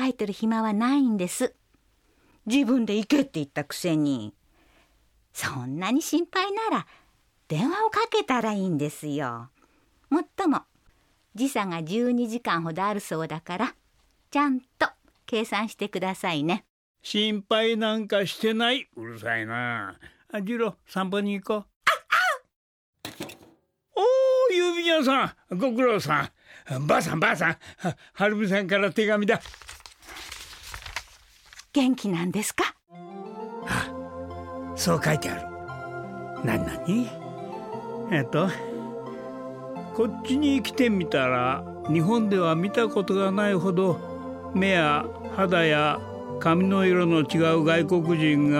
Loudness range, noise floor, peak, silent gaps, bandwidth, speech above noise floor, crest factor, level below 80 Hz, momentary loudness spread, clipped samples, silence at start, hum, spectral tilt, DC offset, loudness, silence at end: 6 LU; -65 dBFS; -8 dBFS; 16.70-16.95 s, 21.76-21.81 s, 22.56-22.93 s; 16.5 kHz; 40 dB; 18 dB; -58 dBFS; 15 LU; under 0.1%; 0 s; none; -5 dB/octave; under 0.1%; -25 LUFS; 0 s